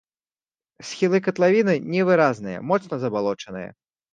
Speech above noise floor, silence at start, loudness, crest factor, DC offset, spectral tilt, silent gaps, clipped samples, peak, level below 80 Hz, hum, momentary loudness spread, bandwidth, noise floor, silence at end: over 69 dB; 0.8 s; -21 LUFS; 18 dB; under 0.1%; -6.5 dB/octave; none; under 0.1%; -4 dBFS; -66 dBFS; none; 17 LU; 9.2 kHz; under -90 dBFS; 0.45 s